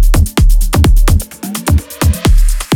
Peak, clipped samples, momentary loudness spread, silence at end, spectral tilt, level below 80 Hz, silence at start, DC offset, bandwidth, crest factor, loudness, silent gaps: 0 dBFS; under 0.1%; 5 LU; 0 s; -5 dB/octave; -10 dBFS; 0 s; under 0.1%; 18 kHz; 8 dB; -13 LUFS; none